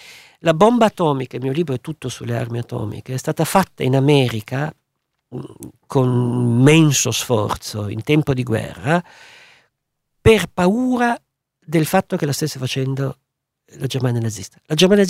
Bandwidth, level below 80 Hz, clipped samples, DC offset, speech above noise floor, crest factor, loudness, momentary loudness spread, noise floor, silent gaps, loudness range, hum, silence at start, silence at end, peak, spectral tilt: 16 kHz; -46 dBFS; under 0.1%; under 0.1%; 57 dB; 18 dB; -18 LUFS; 13 LU; -74 dBFS; none; 5 LU; none; 0.05 s; 0 s; 0 dBFS; -5.5 dB/octave